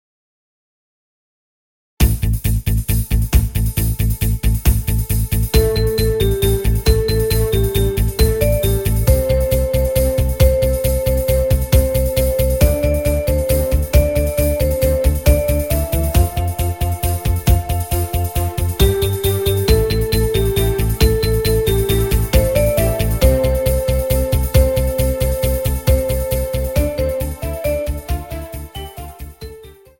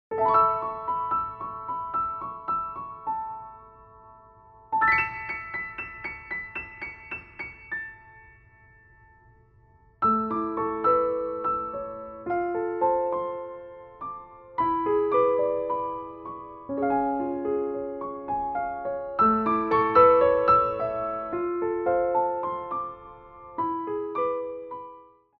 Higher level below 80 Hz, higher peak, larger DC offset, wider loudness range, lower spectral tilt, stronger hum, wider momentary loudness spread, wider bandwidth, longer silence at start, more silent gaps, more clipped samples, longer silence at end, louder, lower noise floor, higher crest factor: first, -20 dBFS vs -56 dBFS; first, 0 dBFS vs -6 dBFS; first, 0.4% vs under 0.1%; second, 4 LU vs 11 LU; second, -5.5 dB/octave vs -9 dB/octave; neither; second, 5 LU vs 17 LU; first, 17 kHz vs 5.8 kHz; first, 2 s vs 0.1 s; neither; neither; about the same, 0.3 s vs 0.35 s; first, -17 LUFS vs -26 LUFS; second, -39 dBFS vs -58 dBFS; second, 16 dB vs 22 dB